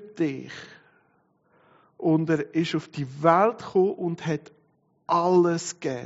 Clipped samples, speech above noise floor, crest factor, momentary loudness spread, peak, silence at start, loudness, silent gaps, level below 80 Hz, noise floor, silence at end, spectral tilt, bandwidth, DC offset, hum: under 0.1%; 42 dB; 22 dB; 14 LU; -4 dBFS; 0 s; -24 LUFS; none; -70 dBFS; -66 dBFS; 0 s; -6 dB/octave; 8 kHz; under 0.1%; none